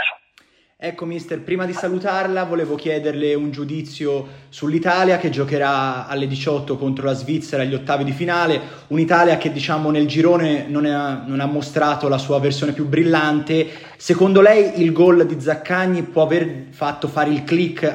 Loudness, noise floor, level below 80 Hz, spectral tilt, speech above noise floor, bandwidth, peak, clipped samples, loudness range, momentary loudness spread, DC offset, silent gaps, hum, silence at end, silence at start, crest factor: -18 LUFS; -55 dBFS; -62 dBFS; -6.5 dB/octave; 37 dB; 10 kHz; 0 dBFS; under 0.1%; 7 LU; 11 LU; under 0.1%; none; none; 0 s; 0 s; 18 dB